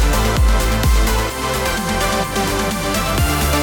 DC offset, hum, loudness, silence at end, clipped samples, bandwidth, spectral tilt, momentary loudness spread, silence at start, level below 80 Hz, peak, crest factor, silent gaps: under 0.1%; none; -17 LUFS; 0 s; under 0.1%; 19.5 kHz; -4 dB/octave; 3 LU; 0 s; -20 dBFS; -6 dBFS; 10 dB; none